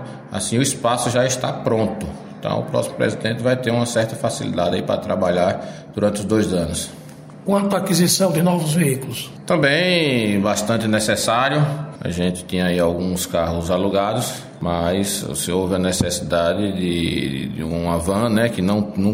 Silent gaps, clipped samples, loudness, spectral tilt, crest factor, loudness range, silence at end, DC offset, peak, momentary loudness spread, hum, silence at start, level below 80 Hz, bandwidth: none; under 0.1%; -20 LUFS; -5 dB/octave; 16 dB; 3 LU; 0 s; under 0.1%; -2 dBFS; 8 LU; none; 0 s; -44 dBFS; 16 kHz